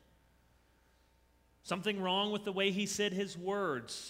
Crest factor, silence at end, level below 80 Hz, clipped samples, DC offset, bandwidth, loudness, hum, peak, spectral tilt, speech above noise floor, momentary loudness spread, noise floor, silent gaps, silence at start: 20 dB; 0 s; -72 dBFS; under 0.1%; under 0.1%; 16 kHz; -35 LUFS; none; -18 dBFS; -3.5 dB/octave; 34 dB; 5 LU; -69 dBFS; none; 1.65 s